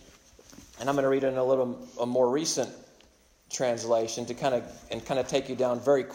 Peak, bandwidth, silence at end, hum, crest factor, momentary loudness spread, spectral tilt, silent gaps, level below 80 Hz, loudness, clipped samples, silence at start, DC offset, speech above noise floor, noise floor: -12 dBFS; 16 kHz; 0 s; none; 16 dB; 9 LU; -4 dB/octave; none; -62 dBFS; -28 LUFS; under 0.1%; 0.6 s; under 0.1%; 33 dB; -60 dBFS